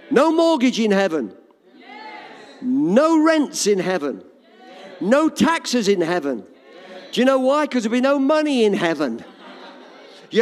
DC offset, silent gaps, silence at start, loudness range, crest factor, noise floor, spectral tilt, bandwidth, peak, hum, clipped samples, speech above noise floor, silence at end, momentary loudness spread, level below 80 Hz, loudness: under 0.1%; none; 0.1 s; 2 LU; 16 dB; -47 dBFS; -4.5 dB/octave; 14.5 kHz; -4 dBFS; none; under 0.1%; 29 dB; 0 s; 21 LU; -66 dBFS; -18 LUFS